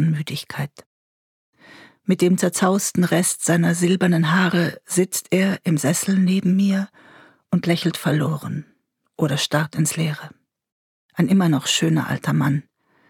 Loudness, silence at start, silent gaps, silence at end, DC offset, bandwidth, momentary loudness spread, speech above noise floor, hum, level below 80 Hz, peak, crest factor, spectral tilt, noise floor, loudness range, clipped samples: -20 LUFS; 0 s; 0.86-1.53 s, 10.72-11.09 s; 0.5 s; under 0.1%; 18 kHz; 10 LU; 28 dB; none; -66 dBFS; -4 dBFS; 18 dB; -5 dB/octave; -48 dBFS; 4 LU; under 0.1%